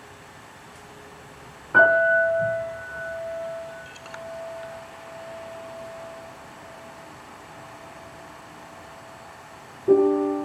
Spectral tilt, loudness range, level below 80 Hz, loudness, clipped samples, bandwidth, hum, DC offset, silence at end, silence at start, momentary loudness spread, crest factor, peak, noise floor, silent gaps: -5 dB/octave; 19 LU; -62 dBFS; -23 LUFS; under 0.1%; 14 kHz; none; under 0.1%; 0 s; 0 s; 25 LU; 22 dB; -6 dBFS; -46 dBFS; none